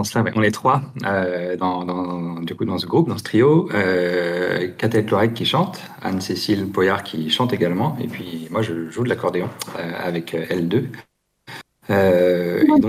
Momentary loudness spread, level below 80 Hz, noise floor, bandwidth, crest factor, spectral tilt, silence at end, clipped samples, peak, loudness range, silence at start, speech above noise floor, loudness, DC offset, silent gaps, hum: 11 LU; -60 dBFS; -41 dBFS; 16 kHz; 16 dB; -6 dB/octave; 0 s; under 0.1%; -4 dBFS; 5 LU; 0 s; 21 dB; -20 LUFS; under 0.1%; none; none